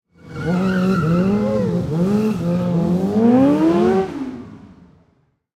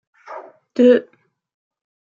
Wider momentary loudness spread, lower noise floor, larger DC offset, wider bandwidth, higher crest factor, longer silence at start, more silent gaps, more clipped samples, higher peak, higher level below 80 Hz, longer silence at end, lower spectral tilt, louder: second, 13 LU vs 23 LU; first, -61 dBFS vs -38 dBFS; neither; first, 11.5 kHz vs 7.2 kHz; about the same, 14 dB vs 18 dB; about the same, 0.25 s vs 0.3 s; neither; neither; about the same, -4 dBFS vs -2 dBFS; first, -48 dBFS vs -74 dBFS; second, 0.9 s vs 1.1 s; first, -8.5 dB/octave vs -6 dB/octave; about the same, -17 LUFS vs -15 LUFS